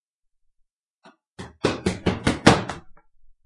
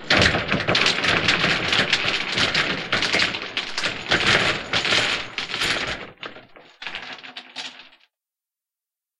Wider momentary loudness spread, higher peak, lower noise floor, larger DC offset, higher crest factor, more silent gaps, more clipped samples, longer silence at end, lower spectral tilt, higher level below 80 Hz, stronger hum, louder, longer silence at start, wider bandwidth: first, 23 LU vs 17 LU; about the same, 0 dBFS vs -2 dBFS; second, -70 dBFS vs -89 dBFS; neither; about the same, 26 dB vs 22 dB; neither; neither; second, 0.55 s vs 1.4 s; first, -5 dB/octave vs -2.5 dB/octave; about the same, -44 dBFS vs -46 dBFS; neither; about the same, -22 LUFS vs -20 LUFS; first, 1.4 s vs 0 s; about the same, 11.5 kHz vs 12.5 kHz